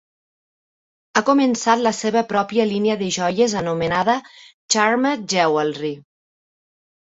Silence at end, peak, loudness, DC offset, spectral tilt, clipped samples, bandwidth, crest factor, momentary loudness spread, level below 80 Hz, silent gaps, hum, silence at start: 1.1 s; -2 dBFS; -19 LUFS; under 0.1%; -4 dB/octave; under 0.1%; 8.2 kHz; 18 dB; 6 LU; -58 dBFS; 4.54-4.69 s; none; 1.15 s